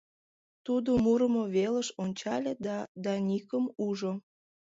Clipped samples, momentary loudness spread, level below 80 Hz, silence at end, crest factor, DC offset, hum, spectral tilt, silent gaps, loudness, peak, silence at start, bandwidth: under 0.1%; 10 LU; -62 dBFS; 0.55 s; 14 dB; under 0.1%; none; -6 dB/octave; 2.88-2.95 s; -31 LUFS; -16 dBFS; 0.65 s; 7.8 kHz